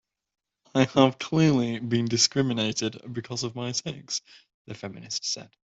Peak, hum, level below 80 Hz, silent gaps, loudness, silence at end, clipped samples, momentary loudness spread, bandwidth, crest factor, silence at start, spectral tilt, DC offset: -6 dBFS; none; -64 dBFS; 4.54-4.65 s; -26 LUFS; 0.2 s; under 0.1%; 13 LU; 8.2 kHz; 22 dB; 0.75 s; -4.5 dB/octave; under 0.1%